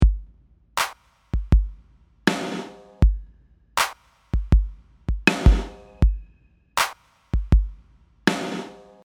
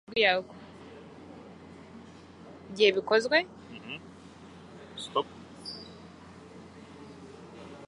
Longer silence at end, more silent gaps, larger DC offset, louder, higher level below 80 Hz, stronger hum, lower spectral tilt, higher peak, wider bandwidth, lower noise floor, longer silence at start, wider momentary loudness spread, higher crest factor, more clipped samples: first, 0.35 s vs 0 s; neither; neither; first, -24 LUFS vs -28 LUFS; first, -24 dBFS vs -66 dBFS; neither; first, -5 dB/octave vs -3.5 dB/octave; first, 0 dBFS vs -10 dBFS; first, 17.5 kHz vs 11 kHz; first, -57 dBFS vs -50 dBFS; about the same, 0 s vs 0.1 s; second, 15 LU vs 25 LU; about the same, 22 dB vs 24 dB; neither